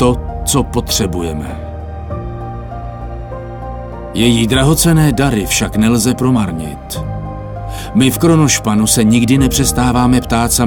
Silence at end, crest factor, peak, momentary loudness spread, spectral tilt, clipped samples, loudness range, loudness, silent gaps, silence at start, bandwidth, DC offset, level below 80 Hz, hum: 0 s; 14 dB; 0 dBFS; 16 LU; -4.5 dB/octave; under 0.1%; 8 LU; -13 LUFS; none; 0 s; 19 kHz; under 0.1%; -26 dBFS; none